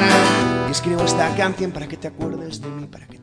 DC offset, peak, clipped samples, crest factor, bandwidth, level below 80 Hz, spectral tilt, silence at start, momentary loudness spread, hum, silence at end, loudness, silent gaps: under 0.1%; 0 dBFS; under 0.1%; 20 dB; 11 kHz; -46 dBFS; -4.5 dB/octave; 0 s; 16 LU; none; 0.05 s; -20 LUFS; none